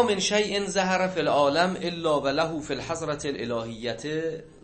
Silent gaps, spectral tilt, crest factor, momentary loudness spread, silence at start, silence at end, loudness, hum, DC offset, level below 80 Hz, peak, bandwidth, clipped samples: none; -4 dB/octave; 18 dB; 9 LU; 0 s; 0.15 s; -26 LUFS; none; under 0.1%; -54 dBFS; -8 dBFS; 8.8 kHz; under 0.1%